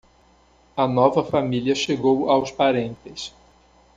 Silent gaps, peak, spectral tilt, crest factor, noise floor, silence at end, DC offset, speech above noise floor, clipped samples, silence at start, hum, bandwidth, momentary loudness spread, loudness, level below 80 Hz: none; -4 dBFS; -5.5 dB/octave; 20 dB; -56 dBFS; 0.7 s; under 0.1%; 36 dB; under 0.1%; 0.75 s; none; 9 kHz; 15 LU; -21 LUFS; -56 dBFS